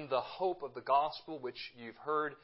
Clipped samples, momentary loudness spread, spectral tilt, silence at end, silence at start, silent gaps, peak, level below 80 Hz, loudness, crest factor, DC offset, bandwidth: under 0.1%; 13 LU; -2 dB/octave; 0.05 s; 0 s; none; -18 dBFS; -78 dBFS; -36 LUFS; 20 dB; under 0.1%; 5.6 kHz